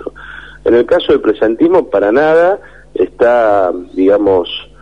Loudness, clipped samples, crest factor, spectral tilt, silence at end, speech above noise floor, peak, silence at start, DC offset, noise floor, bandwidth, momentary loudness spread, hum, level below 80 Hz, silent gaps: -11 LUFS; under 0.1%; 10 dB; -6.5 dB/octave; 0.2 s; 21 dB; -2 dBFS; 0 s; 0.7%; -32 dBFS; 7 kHz; 12 LU; none; -42 dBFS; none